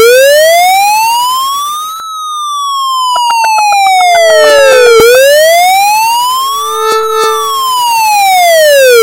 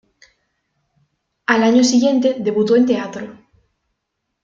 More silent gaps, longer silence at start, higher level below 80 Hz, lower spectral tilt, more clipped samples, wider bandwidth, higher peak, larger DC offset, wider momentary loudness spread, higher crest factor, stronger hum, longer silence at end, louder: neither; second, 0 s vs 1.5 s; first, -48 dBFS vs -62 dBFS; second, 0.5 dB/octave vs -4 dB/octave; first, 0.8% vs under 0.1%; first, 17 kHz vs 7.6 kHz; about the same, 0 dBFS vs -2 dBFS; neither; second, 9 LU vs 16 LU; second, 6 dB vs 16 dB; neither; second, 0 s vs 1.1 s; first, -6 LUFS vs -15 LUFS